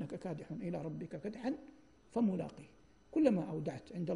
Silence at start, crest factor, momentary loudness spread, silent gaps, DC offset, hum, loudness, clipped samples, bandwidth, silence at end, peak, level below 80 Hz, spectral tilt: 0 s; 22 dB; 12 LU; none; under 0.1%; none; -39 LUFS; under 0.1%; 10.5 kHz; 0 s; -18 dBFS; -70 dBFS; -8.5 dB/octave